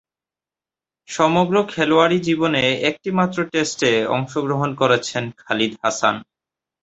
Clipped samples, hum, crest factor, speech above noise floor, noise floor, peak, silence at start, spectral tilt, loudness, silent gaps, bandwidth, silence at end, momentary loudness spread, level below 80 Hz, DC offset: under 0.1%; none; 18 dB; over 71 dB; under -90 dBFS; -2 dBFS; 1.1 s; -4.5 dB/octave; -19 LUFS; none; 8.2 kHz; 0.6 s; 7 LU; -58 dBFS; under 0.1%